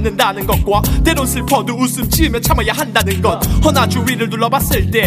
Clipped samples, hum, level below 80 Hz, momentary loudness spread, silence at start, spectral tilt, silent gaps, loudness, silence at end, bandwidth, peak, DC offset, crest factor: under 0.1%; none; -22 dBFS; 3 LU; 0 s; -4.5 dB/octave; none; -14 LUFS; 0 s; 16 kHz; 0 dBFS; under 0.1%; 14 dB